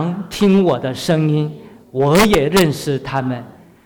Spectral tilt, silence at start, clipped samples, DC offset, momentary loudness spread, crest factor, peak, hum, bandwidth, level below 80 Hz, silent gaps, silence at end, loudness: -6 dB/octave; 0 s; under 0.1%; under 0.1%; 12 LU; 12 dB; -4 dBFS; none; over 20 kHz; -40 dBFS; none; 0.35 s; -16 LUFS